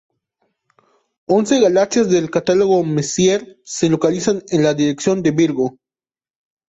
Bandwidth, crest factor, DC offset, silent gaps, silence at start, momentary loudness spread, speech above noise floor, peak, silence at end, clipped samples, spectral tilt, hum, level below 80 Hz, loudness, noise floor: 8.2 kHz; 14 dB; under 0.1%; none; 1.3 s; 6 LU; over 74 dB; -2 dBFS; 1 s; under 0.1%; -5 dB/octave; none; -56 dBFS; -16 LUFS; under -90 dBFS